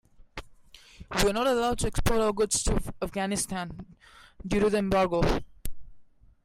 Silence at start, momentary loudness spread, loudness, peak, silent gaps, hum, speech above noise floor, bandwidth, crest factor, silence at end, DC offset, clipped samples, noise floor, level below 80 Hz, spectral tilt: 0.35 s; 20 LU; -27 LUFS; -14 dBFS; none; none; 26 dB; 16 kHz; 16 dB; 0.4 s; under 0.1%; under 0.1%; -53 dBFS; -38 dBFS; -4 dB/octave